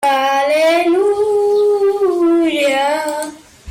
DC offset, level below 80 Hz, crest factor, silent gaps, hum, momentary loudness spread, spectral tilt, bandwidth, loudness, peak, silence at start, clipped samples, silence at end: under 0.1%; -58 dBFS; 8 dB; none; none; 6 LU; -3 dB/octave; 16.5 kHz; -14 LUFS; -6 dBFS; 0 s; under 0.1%; 0 s